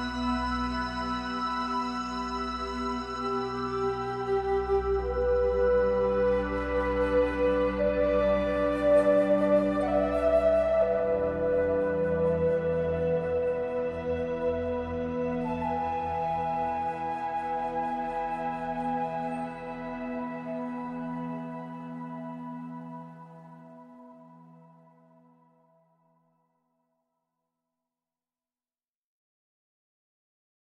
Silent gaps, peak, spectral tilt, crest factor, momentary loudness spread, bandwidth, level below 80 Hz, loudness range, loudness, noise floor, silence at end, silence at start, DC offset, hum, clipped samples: none; -12 dBFS; -7 dB/octave; 16 dB; 12 LU; 9.4 kHz; -46 dBFS; 13 LU; -28 LUFS; under -90 dBFS; 6.2 s; 0 s; under 0.1%; none; under 0.1%